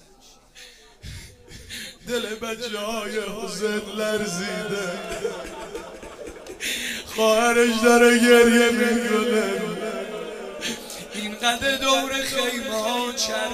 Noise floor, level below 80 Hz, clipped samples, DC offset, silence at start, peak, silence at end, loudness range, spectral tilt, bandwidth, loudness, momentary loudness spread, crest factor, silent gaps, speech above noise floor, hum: -52 dBFS; -52 dBFS; under 0.1%; under 0.1%; 0.55 s; -2 dBFS; 0 s; 11 LU; -3 dB/octave; 16 kHz; -22 LUFS; 20 LU; 22 dB; none; 31 dB; none